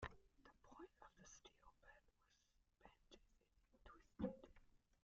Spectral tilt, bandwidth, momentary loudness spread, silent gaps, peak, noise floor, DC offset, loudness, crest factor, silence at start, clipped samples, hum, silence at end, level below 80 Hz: -5.5 dB/octave; 7.4 kHz; 17 LU; none; -34 dBFS; -82 dBFS; under 0.1%; -57 LUFS; 26 dB; 0 s; under 0.1%; none; 0.1 s; -72 dBFS